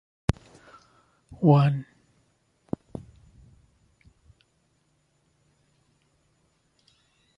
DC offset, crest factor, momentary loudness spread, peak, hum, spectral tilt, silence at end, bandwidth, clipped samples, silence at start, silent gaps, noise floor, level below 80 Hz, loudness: under 0.1%; 26 dB; 24 LU; -4 dBFS; none; -8.5 dB/octave; 5.55 s; 11 kHz; under 0.1%; 1.3 s; none; -69 dBFS; -50 dBFS; -25 LUFS